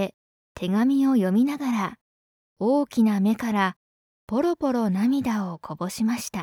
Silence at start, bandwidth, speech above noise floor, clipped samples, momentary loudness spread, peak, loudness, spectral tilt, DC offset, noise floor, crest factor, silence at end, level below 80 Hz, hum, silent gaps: 0 s; 18 kHz; over 67 dB; under 0.1%; 11 LU; -10 dBFS; -24 LUFS; -6 dB/octave; under 0.1%; under -90 dBFS; 14 dB; 0 s; -62 dBFS; none; 0.14-0.55 s, 2.01-2.56 s, 3.76-4.28 s